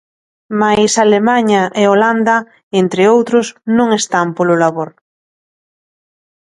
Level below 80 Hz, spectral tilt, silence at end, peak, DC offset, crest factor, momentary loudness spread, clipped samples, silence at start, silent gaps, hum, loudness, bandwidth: -56 dBFS; -4.5 dB/octave; 1.6 s; 0 dBFS; under 0.1%; 14 dB; 6 LU; under 0.1%; 0.5 s; 2.63-2.71 s; none; -12 LUFS; 11.5 kHz